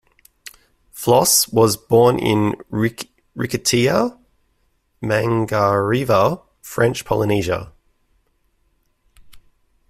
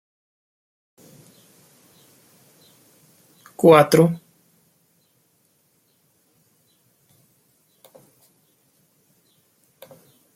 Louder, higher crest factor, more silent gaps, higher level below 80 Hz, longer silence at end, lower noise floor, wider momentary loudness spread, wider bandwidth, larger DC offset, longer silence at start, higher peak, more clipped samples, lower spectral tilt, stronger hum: about the same, -18 LUFS vs -16 LUFS; second, 18 dB vs 24 dB; neither; first, -50 dBFS vs -68 dBFS; second, 0.5 s vs 6.2 s; about the same, -64 dBFS vs -64 dBFS; second, 12 LU vs 23 LU; about the same, 16 kHz vs 16.5 kHz; neither; second, 0.95 s vs 3.6 s; about the same, -2 dBFS vs -2 dBFS; neither; second, -4.5 dB/octave vs -6 dB/octave; neither